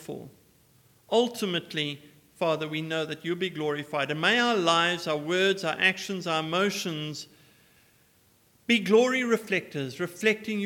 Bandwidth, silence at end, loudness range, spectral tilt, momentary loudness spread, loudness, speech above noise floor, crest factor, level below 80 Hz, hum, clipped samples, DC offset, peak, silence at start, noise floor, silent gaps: 18 kHz; 0 s; 5 LU; -4 dB/octave; 12 LU; -26 LUFS; 36 dB; 20 dB; -76 dBFS; none; under 0.1%; under 0.1%; -8 dBFS; 0 s; -63 dBFS; none